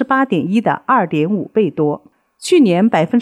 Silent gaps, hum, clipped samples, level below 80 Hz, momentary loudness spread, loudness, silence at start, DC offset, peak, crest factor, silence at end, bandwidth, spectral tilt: none; none; under 0.1%; -64 dBFS; 7 LU; -15 LUFS; 0 s; under 0.1%; -2 dBFS; 12 dB; 0 s; 13 kHz; -6.5 dB/octave